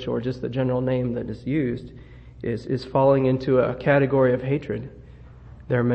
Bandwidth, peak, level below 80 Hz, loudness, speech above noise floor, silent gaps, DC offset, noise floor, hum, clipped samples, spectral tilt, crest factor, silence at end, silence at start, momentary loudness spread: 7.8 kHz; -6 dBFS; -48 dBFS; -23 LUFS; 22 dB; none; under 0.1%; -44 dBFS; none; under 0.1%; -9.5 dB/octave; 18 dB; 0 s; 0 s; 13 LU